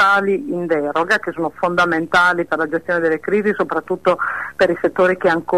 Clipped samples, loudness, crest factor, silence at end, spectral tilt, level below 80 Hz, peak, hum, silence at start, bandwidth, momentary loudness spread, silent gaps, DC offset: under 0.1%; -17 LUFS; 12 dB; 0 s; -5.5 dB/octave; -54 dBFS; -4 dBFS; none; 0 s; 13.5 kHz; 6 LU; none; 0.3%